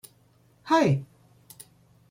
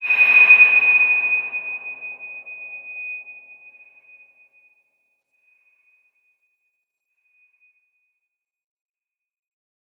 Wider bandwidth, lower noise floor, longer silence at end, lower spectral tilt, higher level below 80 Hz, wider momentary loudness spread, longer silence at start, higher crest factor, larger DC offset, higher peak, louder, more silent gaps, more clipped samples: first, 16.5 kHz vs 13 kHz; second, -61 dBFS vs -89 dBFS; second, 1.05 s vs 6.65 s; first, -6.5 dB/octave vs -2.5 dB/octave; first, -64 dBFS vs -86 dBFS; about the same, 26 LU vs 25 LU; first, 0.65 s vs 0 s; about the same, 20 dB vs 22 dB; neither; second, -8 dBFS vs -2 dBFS; second, -24 LUFS vs -12 LUFS; neither; neither